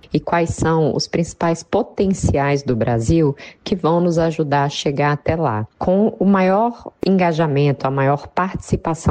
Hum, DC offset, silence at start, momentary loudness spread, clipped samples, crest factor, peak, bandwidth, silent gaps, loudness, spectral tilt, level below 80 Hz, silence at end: none; under 0.1%; 0.1 s; 6 LU; under 0.1%; 12 dB; -6 dBFS; 9.6 kHz; none; -18 LUFS; -6.5 dB/octave; -38 dBFS; 0 s